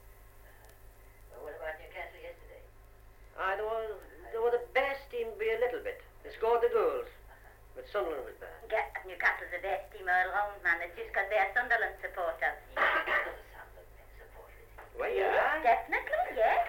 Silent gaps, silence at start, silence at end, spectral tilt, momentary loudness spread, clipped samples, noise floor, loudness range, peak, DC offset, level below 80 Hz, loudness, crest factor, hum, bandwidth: none; 0 s; 0 s; -4 dB/octave; 20 LU; under 0.1%; -55 dBFS; 9 LU; -14 dBFS; under 0.1%; -56 dBFS; -32 LUFS; 20 dB; none; 17 kHz